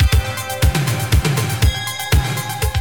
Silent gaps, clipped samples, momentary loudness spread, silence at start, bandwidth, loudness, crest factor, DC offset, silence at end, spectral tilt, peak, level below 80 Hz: none; under 0.1%; 5 LU; 0 s; over 20 kHz; -18 LUFS; 14 dB; 0.7%; 0 s; -4.5 dB/octave; -2 dBFS; -20 dBFS